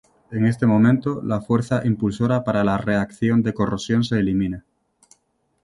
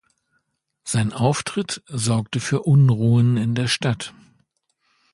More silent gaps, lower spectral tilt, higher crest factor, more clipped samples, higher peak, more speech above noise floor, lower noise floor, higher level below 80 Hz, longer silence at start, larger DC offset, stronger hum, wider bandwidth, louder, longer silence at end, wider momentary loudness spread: neither; first, -7.5 dB/octave vs -5.5 dB/octave; about the same, 16 dB vs 18 dB; neither; about the same, -4 dBFS vs -4 dBFS; second, 48 dB vs 52 dB; about the same, -68 dBFS vs -71 dBFS; first, -48 dBFS vs -54 dBFS; second, 0.3 s vs 0.85 s; neither; neither; about the same, 11.5 kHz vs 11.5 kHz; about the same, -21 LUFS vs -20 LUFS; about the same, 1.05 s vs 1.05 s; second, 7 LU vs 11 LU